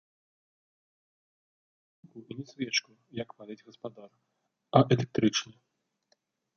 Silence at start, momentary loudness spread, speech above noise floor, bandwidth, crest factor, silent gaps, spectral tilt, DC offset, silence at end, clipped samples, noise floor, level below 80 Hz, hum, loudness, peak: 2.15 s; 21 LU; 44 dB; 7.2 kHz; 28 dB; none; -5 dB/octave; under 0.1%; 1.15 s; under 0.1%; -75 dBFS; -70 dBFS; none; -29 LUFS; -6 dBFS